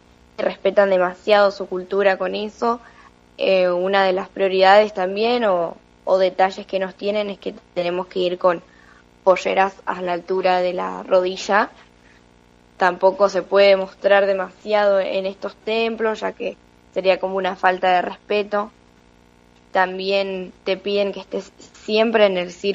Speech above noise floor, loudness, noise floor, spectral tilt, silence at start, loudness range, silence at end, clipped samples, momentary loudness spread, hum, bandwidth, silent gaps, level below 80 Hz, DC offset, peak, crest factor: 33 dB; -19 LUFS; -52 dBFS; -5 dB/octave; 0.4 s; 4 LU; 0 s; under 0.1%; 11 LU; none; 7.8 kHz; none; -60 dBFS; under 0.1%; -2 dBFS; 18 dB